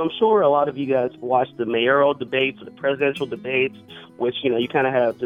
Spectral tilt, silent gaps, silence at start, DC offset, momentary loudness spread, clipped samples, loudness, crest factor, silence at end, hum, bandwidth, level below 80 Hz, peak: -7 dB/octave; none; 0 s; under 0.1%; 8 LU; under 0.1%; -21 LUFS; 16 dB; 0 s; none; 10.5 kHz; -66 dBFS; -4 dBFS